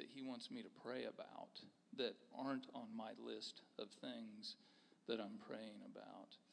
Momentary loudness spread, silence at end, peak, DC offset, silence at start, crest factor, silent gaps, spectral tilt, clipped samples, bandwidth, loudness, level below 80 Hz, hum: 11 LU; 0.1 s; -30 dBFS; under 0.1%; 0 s; 22 dB; none; -4.5 dB/octave; under 0.1%; 10 kHz; -52 LUFS; under -90 dBFS; none